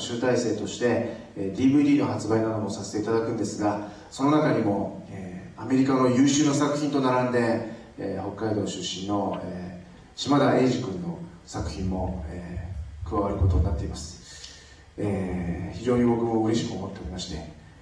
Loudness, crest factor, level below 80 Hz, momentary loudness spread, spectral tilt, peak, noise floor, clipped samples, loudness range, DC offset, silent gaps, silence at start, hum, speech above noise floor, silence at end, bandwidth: -26 LUFS; 14 dB; -42 dBFS; 17 LU; -6 dB/octave; -10 dBFS; -48 dBFS; under 0.1%; 6 LU; under 0.1%; none; 0 s; none; 23 dB; 0 s; 10.5 kHz